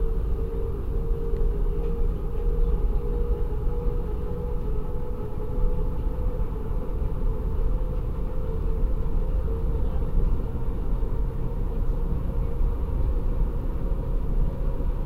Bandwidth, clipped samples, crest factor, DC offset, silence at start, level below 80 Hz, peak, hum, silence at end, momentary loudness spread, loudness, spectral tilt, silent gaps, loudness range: 3.1 kHz; under 0.1%; 12 dB; 0.3%; 0 s; -24 dBFS; -12 dBFS; none; 0 s; 3 LU; -30 LUFS; -10 dB/octave; none; 2 LU